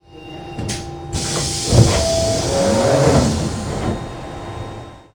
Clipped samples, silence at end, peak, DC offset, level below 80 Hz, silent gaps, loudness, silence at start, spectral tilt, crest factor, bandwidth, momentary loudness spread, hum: under 0.1%; 0.15 s; 0 dBFS; under 0.1%; -30 dBFS; none; -17 LUFS; 0.1 s; -5 dB/octave; 18 dB; 19.5 kHz; 17 LU; none